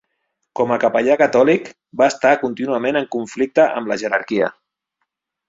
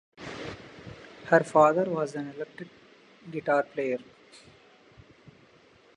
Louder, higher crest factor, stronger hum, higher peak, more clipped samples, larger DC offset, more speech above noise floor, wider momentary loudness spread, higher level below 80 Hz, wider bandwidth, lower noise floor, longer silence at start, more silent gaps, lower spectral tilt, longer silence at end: first, -17 LUFS vs -27 LUFS; second, 18 dB vs 24 dB; neither; first, -2 dBFS vs -6 dBFS; neither; neither; first, 58 dB vs 33 dB; second, 8 LU vs 24 LU; about the same, -62 dBFS vs -66 dBFS; second, 7.8 kHz vs 11 kHz; first, -75 dBFS vs -58 dBFS; first, 0.55 s vs 0.2 s; neither; about the same, -5 dB/octave vs -6 dB/octave; second, 0.95 s vs 1.95 s